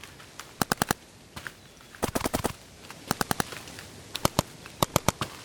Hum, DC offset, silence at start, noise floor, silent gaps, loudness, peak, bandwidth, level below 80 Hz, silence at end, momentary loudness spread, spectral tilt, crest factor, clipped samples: none; under 0.1%; 0.05 s; -50 dBFS; none; -30 LUFS; -4 dBFS; over 20 kHz; -50 dBFS; 0 s; 17 LU; -3.5 dB/octave; 28 dB; under 0.1%